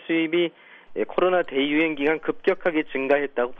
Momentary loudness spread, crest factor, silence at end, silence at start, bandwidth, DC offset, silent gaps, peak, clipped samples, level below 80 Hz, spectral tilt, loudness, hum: 6 LU; 16 dB; 0 s; 0 s; 5 kHz; under 0.1%; none; -8 dBFS; under 0.1%; -58 dBFS; -7.5 dB/octave; -23 LUFS; none